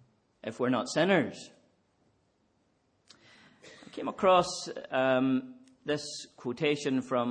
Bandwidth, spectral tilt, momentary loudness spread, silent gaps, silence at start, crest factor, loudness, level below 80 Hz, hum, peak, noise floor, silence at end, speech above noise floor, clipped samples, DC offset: 9.8 kHz; -5 dB/octave; 18 LU; none; 0.45 s; 20 dB; -30 LUFS; -72 dBFS; none; -10 dBFS; -72 dBFS; 0 s; 43 dB; under 0.1%; under 0.1%